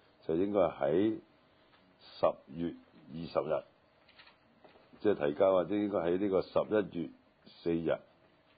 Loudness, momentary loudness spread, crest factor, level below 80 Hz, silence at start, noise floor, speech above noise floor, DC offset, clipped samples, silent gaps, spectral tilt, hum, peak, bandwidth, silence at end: -33 LUFS; 13 LU; 18 dB; -64 dBFS; 0.3 s; -66 dBFS; 34 dB; under 0.1%; under 0.1%; none; -6 dB/octave; none; -16 dBFS; 4.9 kHz; 0.6 s